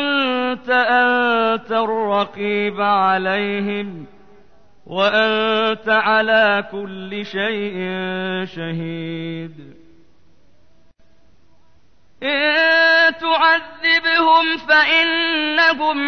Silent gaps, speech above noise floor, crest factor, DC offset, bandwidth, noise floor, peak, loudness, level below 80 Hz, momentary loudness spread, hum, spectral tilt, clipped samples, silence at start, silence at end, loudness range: none; 40 dB; 14 dB; 0.5%; 6.6 kHz; -58 dBFS; -4 dBFS; -16 LUFS; -60 dBFS; 13 LU; none; -5.5 dB/octave; under 0.1%; 0 s; 0 s; 15 LU